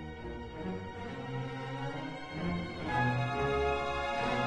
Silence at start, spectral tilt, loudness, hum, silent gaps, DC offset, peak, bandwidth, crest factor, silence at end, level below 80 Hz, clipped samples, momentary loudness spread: 0 s; -6.5 dB/octave; -35 LUFS; none; none; under 0.1%; -18 dBFS; 10.5 kHz; 16 dB; 0 s; -50 dBFS; under 0.1%; 10 LU